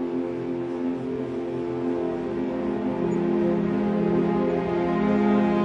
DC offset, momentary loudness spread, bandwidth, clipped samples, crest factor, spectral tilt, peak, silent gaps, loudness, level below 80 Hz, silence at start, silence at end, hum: under 0.1%; 8 LU; 7.2 kHz; under 0.1%; 14 dB; -9 dB/octave; -10 dBFS; none; -25 LUFS; -52 dBFS; 0 s; 0 s; none